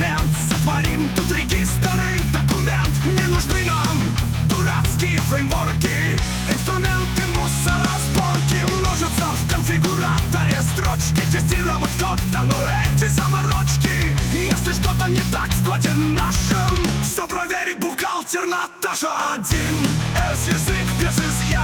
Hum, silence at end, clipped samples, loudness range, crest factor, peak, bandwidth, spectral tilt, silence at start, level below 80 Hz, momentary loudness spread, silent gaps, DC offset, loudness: none; 0 s; under 0.1%; 2 LU; 14 dB; -6 dBFS; 19.5 kHz; -4.5 dB/octave; 0 s; -28 dBFS; 3 LU; none; under 0.1%; -20 LUFS